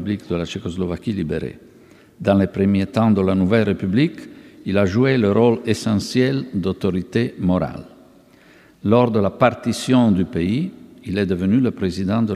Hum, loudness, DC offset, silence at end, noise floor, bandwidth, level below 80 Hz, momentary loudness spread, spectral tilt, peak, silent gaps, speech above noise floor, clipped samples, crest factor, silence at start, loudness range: none; -19 LUFS; under 0.1%; 0 s; -49 dBFS; 13 kHz; -48 dBFS; 10 LU; -7 dB/octave; -2 dBFS; none; 31 dB; under 0.1%; 18 dB; 0 s; 3 LU